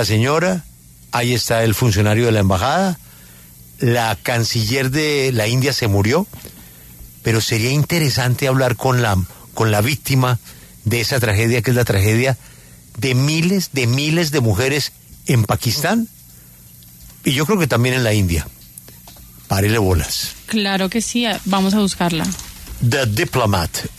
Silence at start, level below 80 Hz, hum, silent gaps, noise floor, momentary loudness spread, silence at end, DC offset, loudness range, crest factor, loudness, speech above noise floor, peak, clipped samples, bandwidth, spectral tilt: 0 s; -40 dBFS; none; none; -43 dBFS; 8 LU; 0.05 s; under 0.1%; 2 LU; 14 dB; -17 LUFS; 26 dB; -4 dBFS; under 0.1%; 14 kHz; -5 dB/octave